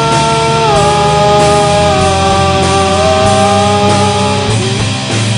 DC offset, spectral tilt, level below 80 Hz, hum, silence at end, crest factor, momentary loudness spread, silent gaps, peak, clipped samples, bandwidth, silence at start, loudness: 0.3%; -4.5 dB/octave; -28 dBFS; none; 0 s; 10 dB; 4 LU; none; 0 dBFS; 0.3%; 10.5 kHz; 0 s; -9 LUFS